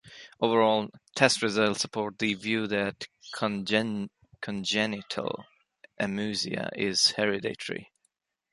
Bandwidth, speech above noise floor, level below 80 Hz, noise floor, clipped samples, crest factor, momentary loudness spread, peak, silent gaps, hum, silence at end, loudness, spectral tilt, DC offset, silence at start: 11.5 kHz; 48 dB; -68 dBFS; -76 dBFS; under 0.1%; 24 dB; 14 LU; -6 dBFS; none; none; 0.7 s; -28 LUFS; -3.5 dB/octave; under 0.1%; 0.05 s